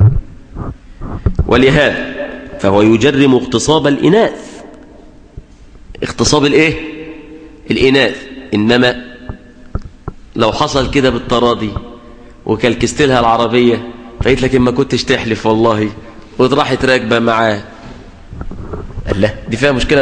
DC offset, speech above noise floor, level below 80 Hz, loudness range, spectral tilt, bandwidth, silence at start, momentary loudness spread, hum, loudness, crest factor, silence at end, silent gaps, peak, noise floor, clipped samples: under 0.1%; 26 dB; -28 dBFS; 4 LU; -5.5 dB/octave; 10 kHz; 0 s; 20 LU; none; -12 LUFS; 14 dB; 0 s; none; 0 dBFS; -38 dBFS; under 0.1%